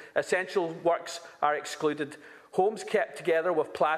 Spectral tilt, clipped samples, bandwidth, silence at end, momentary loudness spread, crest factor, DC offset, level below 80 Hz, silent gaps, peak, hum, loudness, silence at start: -4 dB/octave; under 0.1%; 14 kHz; 0 s; 8 LU; 18 dB; under 0.1%; -78 dBFS; none; -10 dBFS; none; -29 LUFS; 0 s